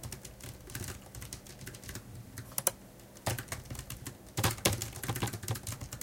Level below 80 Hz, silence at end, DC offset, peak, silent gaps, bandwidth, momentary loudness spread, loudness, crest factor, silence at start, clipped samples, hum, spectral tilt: -54 dBFS; 0 s; under 0.1%; -8 dBFS; none; 17 kHz; 15 LU; -37 LUFS; 32 dB; 0 s; under 0.1%; none; -3 dB/octave